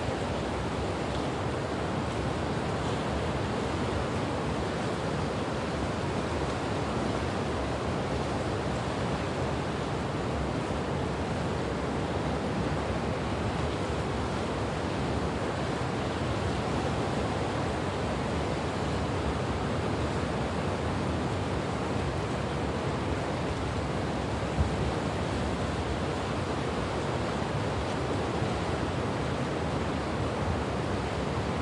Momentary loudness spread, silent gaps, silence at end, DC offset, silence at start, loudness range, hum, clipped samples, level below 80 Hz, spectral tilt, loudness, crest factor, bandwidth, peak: 1 LU; none; 0 s; under 0.1%; 0 s; 1 LU; none; under 0.1%; -42 dBFS; -6 dB/octave; -31 LUFS; 16 dB; 11.5 kHz; -14 dBFS